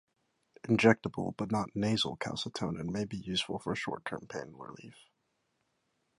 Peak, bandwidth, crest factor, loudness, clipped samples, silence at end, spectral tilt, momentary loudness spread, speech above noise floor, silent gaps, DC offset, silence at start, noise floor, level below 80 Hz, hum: -8 dBFS; 11.5 kHz; 26 dB; -33 LUFS; under 0.1%; 1.25 s; -5.5 dB/octave; 19 LU; 46 dB; none; under 0.1%; 0.65 s; -79 dBFS; -64 dBFS; none